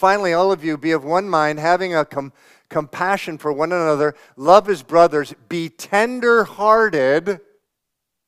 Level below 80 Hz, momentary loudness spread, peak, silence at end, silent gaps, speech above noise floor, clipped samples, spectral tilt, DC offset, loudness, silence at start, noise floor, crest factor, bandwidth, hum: -58 dBFS; 12 LU; 0 dBFS; 0.9 s; none; 62 dB; under 0.1%; -5 dB/octave; under 0.1%; -18 LUFS; 0 s; -79 dBFS; 18 dB; 15 kHz; none